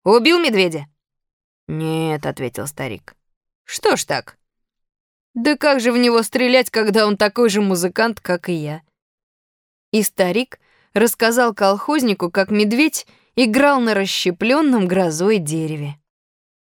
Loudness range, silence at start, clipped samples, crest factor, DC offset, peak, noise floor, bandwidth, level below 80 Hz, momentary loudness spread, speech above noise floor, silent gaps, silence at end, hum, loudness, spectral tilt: 7 LU; 0.05 s; under 0.1%; 18 dB; under 0.1%; -2 dBFS; -73 dBFS; over 20 kHz; -60 dBFS; 12 LU; 56 dB; 1.33-1.67 s, 3.36-3.41 s, 3.55-3.65 s, 5.00-5.34 s, 9.02-9.92 s; 0.8 s; none; -17 LUFS; -4.5 dB/octave